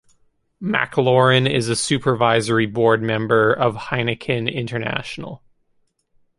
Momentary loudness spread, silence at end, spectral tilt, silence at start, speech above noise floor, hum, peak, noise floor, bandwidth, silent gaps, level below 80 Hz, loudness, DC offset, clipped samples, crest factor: 10 LU; 1 s; -5 dB/octave; 0.6 s; 46 dB; none; -2 dBFS; -65 dBFS; 11.5 kHz; none; -54 dBFS; -19 LUFS; under 0.1%; under 0.1%; 18 dB